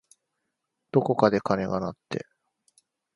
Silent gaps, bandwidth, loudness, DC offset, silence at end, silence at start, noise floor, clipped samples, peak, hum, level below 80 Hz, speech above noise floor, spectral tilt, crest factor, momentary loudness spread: none; 11.5 kHz; -26 LUFS; under 0.1%; 0.95 s; 0.95 s; -81 dBFS; under 0.1%; -4 dBFS; none; -60 dBFS; 56 dB; -7.5 dB/octave; 26 dB; 14 LU